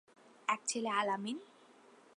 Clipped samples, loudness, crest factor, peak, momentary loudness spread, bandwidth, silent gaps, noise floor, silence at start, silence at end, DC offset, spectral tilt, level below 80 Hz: under 0.1%; -37 LUFS; 22 dB; -18 dBFS; 9 LU; 11 kHz; none; -62 dBFS; 0.5 s; 0.7 s; under 0.1%; -2.5 dB/octave; under -90 dBFS